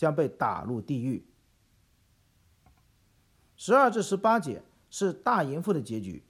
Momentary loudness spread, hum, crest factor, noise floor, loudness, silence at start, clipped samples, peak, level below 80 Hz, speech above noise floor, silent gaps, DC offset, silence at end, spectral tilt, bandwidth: 16 LU; none; 20 dB; -66 dBFS; -28 LUFS; 0 s; under 0.1%; -10 dBFS; -66 dBFS; 39 dB; none; under 0.1%; 0.1 s; -6 dB/octave; 15 kHz